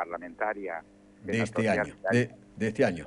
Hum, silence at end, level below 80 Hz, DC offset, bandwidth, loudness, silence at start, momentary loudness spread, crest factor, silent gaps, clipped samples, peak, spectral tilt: none; 0 s; -60 dBFS; under 0.1%; 11 kHz; -30 LUFS; 0 s; 10 LU; 18 dB; none; under 0.1%; -12 dBFS; -6.5 dB/octave